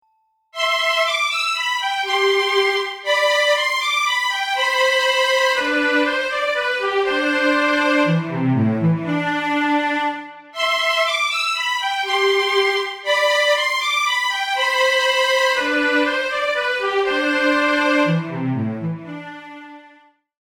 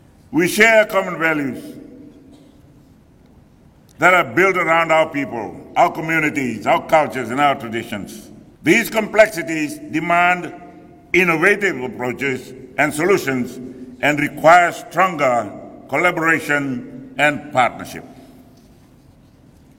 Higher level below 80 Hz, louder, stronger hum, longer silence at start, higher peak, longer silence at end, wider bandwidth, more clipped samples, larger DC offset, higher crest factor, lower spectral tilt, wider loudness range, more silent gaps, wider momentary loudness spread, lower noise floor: second, -62 dBFS vs -54 dBFS; about the same, -18 LUFS vs -17 LUFS; neither; first, 0.55 s vs 0.3 s; second, -6 dBFS vs 0 dBFS; second, 0.7 s vs 1.6 s; first, 20 kHz vs 17 kHz; neither; neither; about the same, 14 dB vs 18 dB; about the same, -4 dB/octave vs -4.5 dB/octave; about the same, 2 LU vs 4 LU; neither; second, 7 LU vs 16 LU; first, -65 dBFS vs -49 dBFS